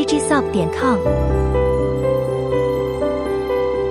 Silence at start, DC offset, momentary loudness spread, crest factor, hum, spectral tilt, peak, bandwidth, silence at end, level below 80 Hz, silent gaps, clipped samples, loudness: 0 s; under 0.1%; 3 LU; 14 dB; none; -6 dB/octave; -4 dBFS; 13.5 kHz; 0 s; -28 dBFS; none; under 0.1%; -19 LUFS